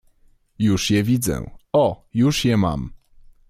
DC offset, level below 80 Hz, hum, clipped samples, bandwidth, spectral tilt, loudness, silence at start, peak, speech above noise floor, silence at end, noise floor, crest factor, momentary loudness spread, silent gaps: under 0.1%; -42 dBFS; none; under 0.1%; 16 kHz; -5.5 dB/octave; -20 LUFS; 0.6 s; -8 dBFS; 37 dB; 0.55 s; -56 dBFS; 14 dB; 9 LU; none